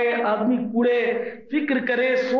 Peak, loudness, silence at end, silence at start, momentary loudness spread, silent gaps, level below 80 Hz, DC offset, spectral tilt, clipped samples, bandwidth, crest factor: -12 dBFS; -22 LUFS; 0 s; 0 s; 6 LU; none; -68 dBFS; under 0.1%; -6.5 dB/octave; under 0.1%; 6.6 kHz; 10 dB